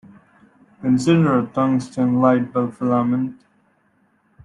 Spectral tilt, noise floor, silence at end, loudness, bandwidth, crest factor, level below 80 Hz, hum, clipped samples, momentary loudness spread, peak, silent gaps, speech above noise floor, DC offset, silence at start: -7.5 dB/octave; -62 dBFS; 1.1 s; -19 LUFS; 11 kHz; 18 dB; -60 dBFS; none; under 0.1%; 8 LU; -2 dBFS; none; 44 dB; under 0.1%; 0.8 s